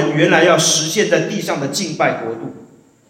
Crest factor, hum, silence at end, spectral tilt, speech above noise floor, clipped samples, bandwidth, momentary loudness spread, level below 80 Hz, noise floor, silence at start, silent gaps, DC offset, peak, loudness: 16 dB; none; 0.45 s; -3 dB/octave; 29 dB; under 0.1%; 16.5 kHz; 14 LU; -64 dBFS; -45 dBFS; 0 s; none; under 0.1%; 0 dBFS; -15 LUFS